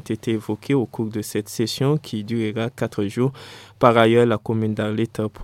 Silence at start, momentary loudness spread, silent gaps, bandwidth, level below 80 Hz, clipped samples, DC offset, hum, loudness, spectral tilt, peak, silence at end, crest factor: 0.05 s; 11 LU; none; 16.5 kHz; -56 dBFS; under 0.1%; under 0.1%; none; -21 LUFS; -6.5 dB/octave; 0 dBFS; 0 s; 20 dB